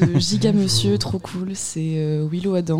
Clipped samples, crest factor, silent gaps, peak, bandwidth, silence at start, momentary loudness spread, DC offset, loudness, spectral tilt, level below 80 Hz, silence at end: under 0.1%; 14 dB; none; -6 dBFS; 15.5 kHz; 0 s; 8 LU; under 0.1%; -21 LUFS; -5.5 dB/octave; -48 dBFS; 0 s